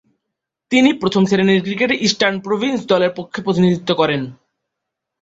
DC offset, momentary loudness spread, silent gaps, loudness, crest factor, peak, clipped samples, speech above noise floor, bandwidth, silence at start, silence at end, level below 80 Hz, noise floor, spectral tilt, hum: under 0.1%; 6 LU; none; -16 LUFS; 16 dB; -2 dBFS; under 0.1%; 64 dB; 8 kHz; 0.7 s; 0.9 s; -56 dBFS; -80 dBFS; -5.5 dB/octave; none